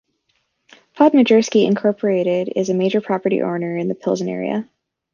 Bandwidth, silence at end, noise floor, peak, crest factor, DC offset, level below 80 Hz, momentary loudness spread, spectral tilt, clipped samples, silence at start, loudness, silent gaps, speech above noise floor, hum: 7.4 kHz; 0.5 s; -68 dBFS; -2 dBFS; 16 dB; under 0.1%; -66 dBFS; 9 LU; -6 dB/octave; under 0.1%; 0.95 s; -18 LUFS; none; 51 dB; none